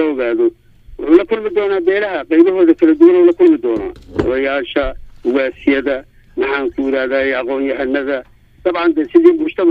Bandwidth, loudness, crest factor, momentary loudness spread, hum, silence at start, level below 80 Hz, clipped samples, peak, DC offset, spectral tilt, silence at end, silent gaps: 5 kHz; -14 LUFS; 14 dB; 12 LU; none; 0 s; -40 dBFS; under 0.1%; 0 dBFS; under 0.1%; -7.5 dB/octave; 0 s; none